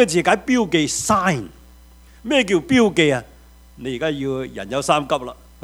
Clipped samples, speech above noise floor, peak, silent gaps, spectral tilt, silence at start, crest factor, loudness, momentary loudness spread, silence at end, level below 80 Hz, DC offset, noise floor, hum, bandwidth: under 0.1%; 27 dB; 0 dBFS; none; -4 dB/octave; 0 s; 20 dB; -19 LUFS; 13 LU; 0.3 s; -46 dBFS; under 0.1%; -46 dBFS; none; 16 kHz